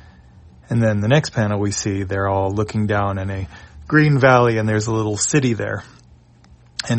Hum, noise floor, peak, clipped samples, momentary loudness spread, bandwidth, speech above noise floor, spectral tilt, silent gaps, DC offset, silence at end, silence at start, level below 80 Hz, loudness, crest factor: none; -49 dBFS; 0 dBFS; under 0.1%; 14 LU; 8.8 kHz; 31 dB; -5.5 dB/octave; none; under 0.1%; 0 s; 0.7 s; -46 dBFS; -18 LUFS; 18 dB